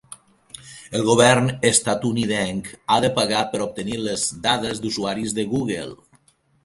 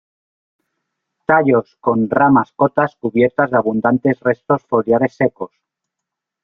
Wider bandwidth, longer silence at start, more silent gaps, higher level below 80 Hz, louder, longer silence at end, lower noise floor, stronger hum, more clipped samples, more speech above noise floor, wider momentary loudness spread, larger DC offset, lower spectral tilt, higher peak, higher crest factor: first, 11.5 kHz vs 5.4 kHz; second, 0.1 s vs 1.3 s; neither; first, -52 dBFS vs -58 dBFS; second, -21 LUFS vs -16 LUFS; second, 0.7 s vs 1 s; second, -59 dBFS vs -82 dBFS; neither; neither; second, 39 dB vs 66 dB; first, 14 LU vs 6 LU; neither; second, -3.5 dB/octave vs -10 dB/octave; about the same, 0 dBFS vs -2 dBFS; first, 22 dB vs 16 dB